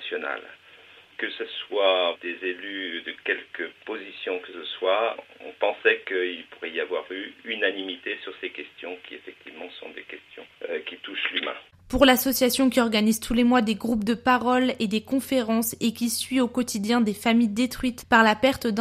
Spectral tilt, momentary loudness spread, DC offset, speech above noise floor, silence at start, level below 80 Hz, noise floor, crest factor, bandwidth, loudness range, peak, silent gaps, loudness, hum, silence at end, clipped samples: -3.5 dB/octave; 17 LU; under 0.1%; 26 dB; 0 s; -52 dBFS; -51 dBFS; 22 dB; 15.5 kHz; 10 LU; -4 dBFS; none; -25 LUFS; none; 0 s; under 0.1%